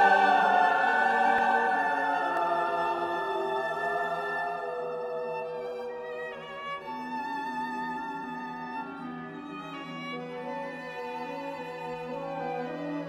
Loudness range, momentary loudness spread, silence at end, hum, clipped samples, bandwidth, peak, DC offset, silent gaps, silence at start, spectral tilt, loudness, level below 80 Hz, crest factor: 11 LU; 14 LU; 0 s; none; under 0.1%; 14 kHz; -10 dBFS; under 0.1%; none; 0 s; -5 dB/octave; -30 LUFS; -70 dBFS; 20 dB